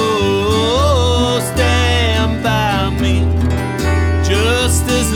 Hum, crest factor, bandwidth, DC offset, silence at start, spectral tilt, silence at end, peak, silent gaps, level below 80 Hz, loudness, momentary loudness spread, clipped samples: none; 12 dB; 16 kHz; under 0.1%; 0 s; -5 dB/octave; 0 s; -2 dBFS; none; -22 dBFS; -14 LUFS; 3 LU; under 0.1%